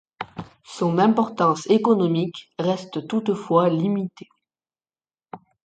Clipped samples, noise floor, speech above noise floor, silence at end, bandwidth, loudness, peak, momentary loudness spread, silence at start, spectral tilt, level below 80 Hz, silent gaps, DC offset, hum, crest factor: under 0.1%; under -90 dBFS; over 69 dB; 0.25 s; 9 kHz; -21 LUFS; -4 dBFS; 17 LU; 0.2 s; -7 dB/octave; -66 dBFS; none; under 0.1%; none; 18 dB